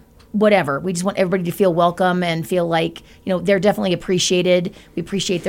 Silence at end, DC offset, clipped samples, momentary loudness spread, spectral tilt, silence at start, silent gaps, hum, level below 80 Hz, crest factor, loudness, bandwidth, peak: 0 s; under 0.1%; under 0.1%; 10 LU; -5 dB/octave; 0.35 s; none; none; -50 dBFS; 16 dB; -18 LUFS; 16.5 kHz; -2 dBFS